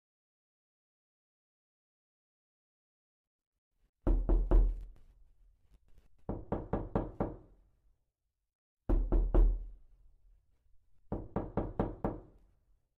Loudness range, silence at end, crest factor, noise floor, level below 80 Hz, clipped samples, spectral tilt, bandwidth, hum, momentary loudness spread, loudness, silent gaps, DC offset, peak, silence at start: 5 LU; 0.8 s; 20 dB; -86 dBFS; -36 dBFS; under 0.1%; -11 dB/octave; 2.4 kHz; none; 17 LU; -36 LUFS; 8.55-8.77 s; under 0.1%; -16 dBFS; 4.05 s